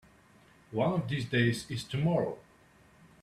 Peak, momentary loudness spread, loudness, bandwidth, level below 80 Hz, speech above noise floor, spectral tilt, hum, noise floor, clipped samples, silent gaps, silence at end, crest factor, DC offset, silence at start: -14 dBFS; 9 LU; -31 LUFS; 13.5 kHz; -62 dBFS; 31 dB; -6.5 dB/octave; none; -61 dBFS; under 0.1%; none; 0.8 s; 20 dB; under 0.1%; 0.7 s